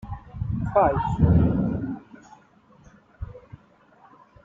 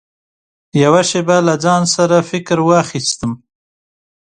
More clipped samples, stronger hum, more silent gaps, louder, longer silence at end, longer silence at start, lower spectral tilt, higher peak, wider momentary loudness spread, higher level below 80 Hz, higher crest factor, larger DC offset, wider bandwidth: neither; neither; neither; second, -23 LUFS vs -14 LUFS; about the same, 1.05 s vs 0.95 s; second, 0.05 s vs 0.75 s; first, -10.5 dB/octave vs -4.5 dB/octave; second, -6 dBFS vs 0 dBFS; first, 21 LU vs 9 LU; first, -38 dBFS vs -52 dBFS; first, 20 dB vs 14 dB; neither; second, 7.2 kHz vs 9.8 kHz